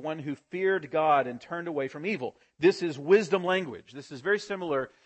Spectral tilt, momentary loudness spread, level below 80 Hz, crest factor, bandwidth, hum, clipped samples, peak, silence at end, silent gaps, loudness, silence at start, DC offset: -5.5 dB/octave; 12 LU; -74 dBFS; 18 dB; 8.6 kHz; none; under 0.1%; -10 dBFS; 0.2 s; none; -28 LUFS; 0 s; under 0.1%